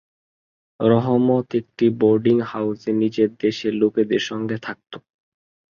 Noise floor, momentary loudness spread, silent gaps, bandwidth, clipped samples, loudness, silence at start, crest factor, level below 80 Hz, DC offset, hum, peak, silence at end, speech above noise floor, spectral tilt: under -90 dBFS; 11 LU; none; 7.2 kHz; under 0.1%; -20 LUFS; 0.8 s; 18 dB; -62 dBFS; under 0.1%; none; -4 dBFS; 0.8 s; over 70 dB; -7.5 dB/octave